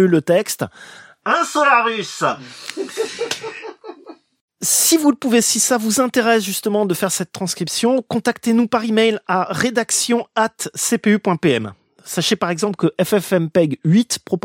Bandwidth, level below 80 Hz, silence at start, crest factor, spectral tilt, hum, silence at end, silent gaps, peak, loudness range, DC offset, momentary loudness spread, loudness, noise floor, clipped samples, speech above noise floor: 17 kHz; -64 dBFS; 0 s; 16 dB; -3.5 dB/octave; none; 0.05 s; 4.41-4.48 s; -2 dBFS; 4 LU; under 0.1%; 12 LU; -17 LUFS; -42 dBFS; under 0.1%; 25 dB